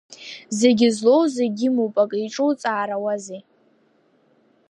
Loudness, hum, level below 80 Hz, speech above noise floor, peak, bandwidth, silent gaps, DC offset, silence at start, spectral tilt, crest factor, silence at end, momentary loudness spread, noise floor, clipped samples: -20 LUFS; none; -72 dBFS; 41 dB; -2 dBFS; 11 kHz; none; under 0.1%; 0.1 s; -4.5 dB/octave; 18 dB; 1.3 s; 18 LU; -61 dBFS; under 0.1%